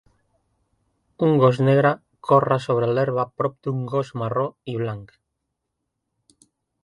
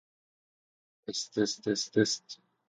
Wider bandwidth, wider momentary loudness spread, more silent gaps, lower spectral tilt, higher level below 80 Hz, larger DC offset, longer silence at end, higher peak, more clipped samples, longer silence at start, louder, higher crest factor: first, 11 kHz vs 9.6 kHz; second, 11 LU vs 14 LU; neither; first, -8.5 dB/octave vs -3.5 dB/octave; first, -62 dBFS vs -76 dBFS; neither; first, 1.8 s vs 0.35 s; first, -4 dBFS vs -12 dBFS; neither; about the same, 1.2 s vs 1.1 s; first, -21 LUFS vs -31 LUFS; about the same, 20 dB vs 22 dB